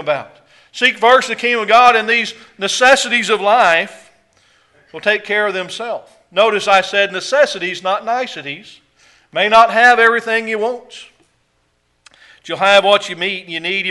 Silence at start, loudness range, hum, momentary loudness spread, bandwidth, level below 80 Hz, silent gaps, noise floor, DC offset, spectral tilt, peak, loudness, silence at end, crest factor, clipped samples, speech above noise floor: 0 s; 5 LU; none; 15 LU; 11.5 kHz; -60 dBFS; none; -62 dBFS; under 0.1%; -2 dB/octave; 0 dBFS; -13 LUFS; 0 s; 16 dB; under 0.1%; 48 dB